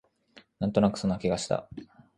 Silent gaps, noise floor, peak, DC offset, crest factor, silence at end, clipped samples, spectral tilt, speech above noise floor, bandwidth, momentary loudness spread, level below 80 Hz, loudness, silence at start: none; -59 dBFS; -8 dBFS; under 0.1%; 22 dB; 0.35 s; under 0.1%; -6 dB/octave; 31 dB; 11 kHz; 16 LU; -54 dBFS; -28 LUFS; 0.35 s